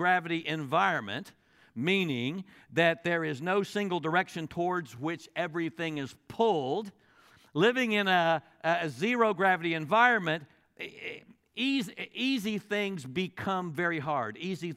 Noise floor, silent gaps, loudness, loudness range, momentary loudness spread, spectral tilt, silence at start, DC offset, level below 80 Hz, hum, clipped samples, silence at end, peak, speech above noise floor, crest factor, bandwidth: -61 dBFS; none; -30 LUFS; 6 LU; 13 LU; -5.5 dB/octave; 0 s; under 0.1%; -74 dBFS; none; under 0.1%; 0 s; -10 dBFS; 31 dB; 20 dB; 15.5 kHz